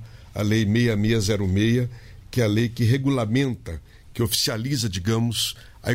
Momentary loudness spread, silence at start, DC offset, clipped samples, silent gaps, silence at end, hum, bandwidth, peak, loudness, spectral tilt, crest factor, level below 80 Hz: 11 LU; 0 s; under 0.1%; under 0.1%; none; 0 s; none; 16 kHz; -6 dBFS; -23 LUFS; -5 dB/octave; 16 dB; -44 dBFS